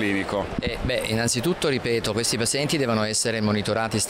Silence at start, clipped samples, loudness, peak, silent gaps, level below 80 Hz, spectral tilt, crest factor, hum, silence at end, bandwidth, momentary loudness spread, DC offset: 0 s; under 0.1%; -23 LUFS; -12 dBFS; none; -44 dBFS; -3.5 dB/octave; 12 dB; none; 0 s; 16 kHz; 4 LU; under 0.1%